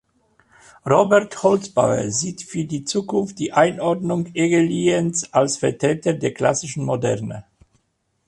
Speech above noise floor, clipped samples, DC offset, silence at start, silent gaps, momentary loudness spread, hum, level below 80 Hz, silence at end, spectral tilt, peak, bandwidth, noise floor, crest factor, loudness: 50 dB; under 0.1%; under 0.1%; 0.85 s; none; 8 LU; none; -56 dBFS; 0.85 s; -5 dB/octave; -2 dBFS; 11.5 kHz; -70 dBFS; 18 dB; -20 LUFS